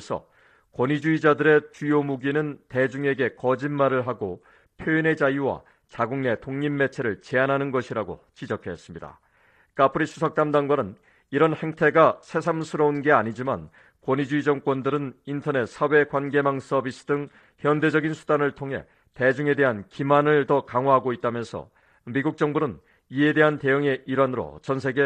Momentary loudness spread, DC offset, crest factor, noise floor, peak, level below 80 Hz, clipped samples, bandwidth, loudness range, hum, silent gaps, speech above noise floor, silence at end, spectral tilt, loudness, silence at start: 13 LU; under 0.1%; 20 dB; -61 dBFS; -4 dBFS; -62 dBFS; under 0.1%; 9.2 kHz; 4 LU; none; none; 37 dB; 0 s; -7 dB/octave; -24 LUFS; 0 s